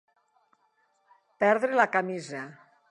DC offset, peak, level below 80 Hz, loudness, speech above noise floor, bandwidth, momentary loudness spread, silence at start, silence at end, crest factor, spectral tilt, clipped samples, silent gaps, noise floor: under 0.1%; -8 dBFS; -84 dBFS; -26 LUFS; 44 dB; 11 kHz; 16 LU; 1.4 s; 0.35 s; 22 dB; -5.5 dB/octave; under 0.1%; none; -70 dBFS